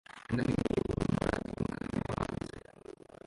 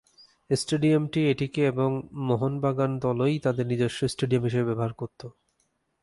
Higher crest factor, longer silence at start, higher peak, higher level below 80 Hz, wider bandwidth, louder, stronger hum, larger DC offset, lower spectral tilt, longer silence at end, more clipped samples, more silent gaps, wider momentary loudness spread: first, 22 dB vs 16 dB; second, 0.1 s vs 0.5 s; second, -14 dBFS vs -10 dBFS; first, -48 dBFS vs -58 dBFS; about the same, 11.5 kHz vs 11.5 kHz; second, -35 LUFS vs -26 LUFS; neither; neither; about the same, -7 dB/octave vs -6.5 dB/octave; second, 0.35 s vs 0.7 s; neither; neither; first, 19 LU vs 8 LU